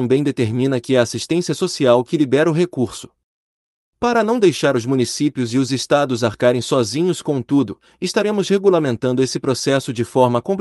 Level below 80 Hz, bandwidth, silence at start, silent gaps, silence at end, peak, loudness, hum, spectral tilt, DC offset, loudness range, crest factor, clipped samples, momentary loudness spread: -58 dBFS; 12 kHz; 0 s; 3.24-3.93 s; 0 s; -2 dBFS; -18 LUFS; none; -5.5 dB/octave; under 0.1%; 1 LU; 16 dB; under 0.1%; 6 LU